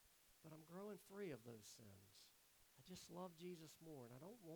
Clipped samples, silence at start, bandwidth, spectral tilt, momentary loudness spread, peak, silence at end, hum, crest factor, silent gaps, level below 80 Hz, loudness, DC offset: under 0.1%; 0 s; over 20 kHz; -5 dB/octave; 13 LU; -42 dBFS; 0 s; none; 18 dB; none; -88 dBFS; -59 LUFS; under 0.1%